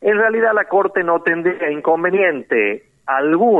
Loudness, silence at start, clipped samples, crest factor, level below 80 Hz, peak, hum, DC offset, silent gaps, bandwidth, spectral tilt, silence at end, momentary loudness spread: -16 LUFS; 0 s; under 0.1%; 12 dB; -68 dBFS; -4 dBFS; none; under 0.1%; none; 4 kHz; -8 dB/octave; 0 s; 5 LU